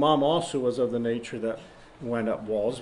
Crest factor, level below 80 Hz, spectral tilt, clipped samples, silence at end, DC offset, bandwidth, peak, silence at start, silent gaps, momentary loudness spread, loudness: 18 dB; -60 dBFS; -5.5 dB/octave; under 0.1%; 0 s; under 0.1%; 11 kHz; -8 dBFS; 0 s; none; 10 LU; -28 LUFS